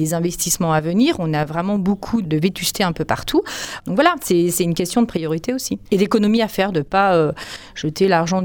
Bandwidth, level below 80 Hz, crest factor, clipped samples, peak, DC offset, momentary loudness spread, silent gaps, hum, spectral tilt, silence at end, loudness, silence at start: over 20 kHz; -44 dBFS; 18 dB; under 0.1%; 0 dBFS; under 0.1%; 7 LU; none; none; -5 dB/octave; 0 s; -19 LUFS; 0 s